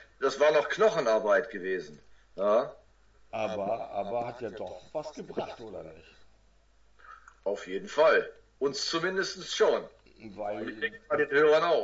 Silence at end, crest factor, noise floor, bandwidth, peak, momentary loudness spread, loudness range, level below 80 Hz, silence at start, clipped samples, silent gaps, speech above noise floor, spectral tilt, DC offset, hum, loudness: 0 s; 18 dB; -62 dBFS; 8 kHz; -12 dBFS; 17 LU; 11 LU; -64 dBFS; 0 s; under 0.1%; none; 33 dB; -3.5 dB/octave; under 0.1%; none; -29 LUFS